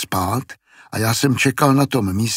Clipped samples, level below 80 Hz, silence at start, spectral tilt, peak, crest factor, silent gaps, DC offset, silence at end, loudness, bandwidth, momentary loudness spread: under 0.1%; -52 dBFS; 0 s; -5 dB/octave; -2 dBFS; 18 dB; none; under 0.1%; 0 s; -18 LUFS; 16.5 kHz; 11 LU